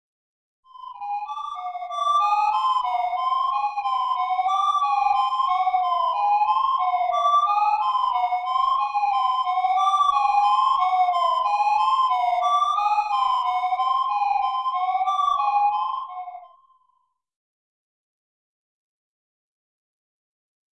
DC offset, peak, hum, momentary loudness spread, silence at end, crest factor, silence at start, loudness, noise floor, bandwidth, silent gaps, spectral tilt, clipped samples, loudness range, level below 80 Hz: under 0.1%; -10 dBFS; none; 8 LU; 4.25 s; 14 dB; 0.75 s; -22 LUFS; -70 dBFS; 10 kHz; none; 1.5 dB/octave; under 0.1%; 5 LU; -64 dBFS